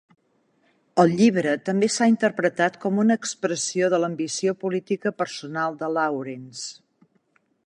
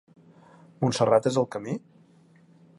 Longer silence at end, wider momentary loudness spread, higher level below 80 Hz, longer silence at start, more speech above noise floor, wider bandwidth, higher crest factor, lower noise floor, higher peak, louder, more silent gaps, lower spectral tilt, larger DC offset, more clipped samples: about the same, 0.95 s vs 1 s; second, 10 LU vs 13 LU; about the same, -70 dBFS vs -66 dBFS; first, 0.95 s vs 0.8 s; first, 44 dB vs 33 dB; about the same, 11 kHz vs 11.5 kHz; about the same, 20 dB vs 20 dB; first, -66 dBFS vs -57 dBFS; first, -4 dBFS vs -8 dBFS; about the same, -23 LUFS vs -25 LUFS; neither; second, -4.5 dB/octave vs -6 dB/octave; neither; neither